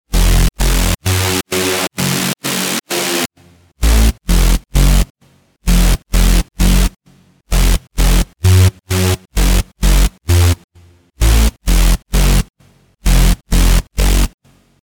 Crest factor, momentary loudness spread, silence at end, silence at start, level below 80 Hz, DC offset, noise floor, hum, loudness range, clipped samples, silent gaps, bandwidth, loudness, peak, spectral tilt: 12 dB; 4 LU; 0.55 s; 0.1 s; -14 dBFS; under 0.1%; -52 dBFS; none; 2 LU; under 0.1%; 5.10-5.15 s, 10.64-10.68 s, 12.50-12.54 s; over 20 kHz; -15 LUFS; 0 dBFS; -4 dB/octave